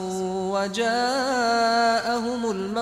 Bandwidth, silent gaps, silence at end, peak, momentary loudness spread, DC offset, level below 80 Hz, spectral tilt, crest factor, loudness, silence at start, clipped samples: 15 kHz; none; 0 s; -10 dBFS; 7 LU; under 0.1%; -58 dBFS; -3.5 dB/octave; 14 dB; -23 LUFS; 0 s; under 0.1%